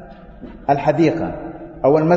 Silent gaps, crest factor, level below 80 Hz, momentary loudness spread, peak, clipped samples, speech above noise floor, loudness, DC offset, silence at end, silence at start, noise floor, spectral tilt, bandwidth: none; 16 dB; -44 dBFS; 19 LU; -2 dBFS; under 0.1%; 22 dB; -18 LUFS; under 0.1%; 0 s; 0 s; -37 dBFS; -8.5 dB/octave; 7.4 kHz